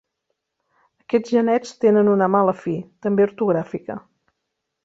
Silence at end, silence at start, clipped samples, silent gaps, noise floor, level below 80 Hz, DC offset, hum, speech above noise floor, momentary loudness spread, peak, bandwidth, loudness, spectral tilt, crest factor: 0.85 s; 1.1 s; under 0.1%; none; -78 dBFS; -66 dBFS; under 0.1%; none; 59 dB; 13 LU; -4 dBFS; 7.8 kHz; -20 LUFS; -7.5 dB/octave; 16 dB